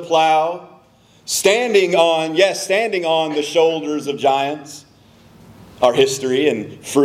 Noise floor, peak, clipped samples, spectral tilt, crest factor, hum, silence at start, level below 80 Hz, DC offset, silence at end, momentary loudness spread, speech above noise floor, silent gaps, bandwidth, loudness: -51 dBFS; 0 dBFS; under 0.1%; -3 dB/octave; 18 dB; none; 0 s; -64 dBFS; under 0.1%; 0 s; 10 LU; 34 dB; none; 15.5 kHz; -17 LUFS